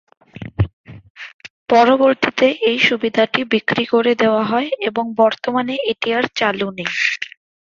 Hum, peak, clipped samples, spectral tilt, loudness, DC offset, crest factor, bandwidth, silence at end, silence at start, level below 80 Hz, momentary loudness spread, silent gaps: none; -2 dBFS; under 0.1%; -5.5 dB/octave; -17 LUFS; under 0.1%; 16 dB; 7.6 kHz; 0.5 s; 0.4 s; -44 dBFS; 17 LU; 0.73-0.84 s, 1.10-1.15 s, 1.33-1.39 s, 1.50-1.66 s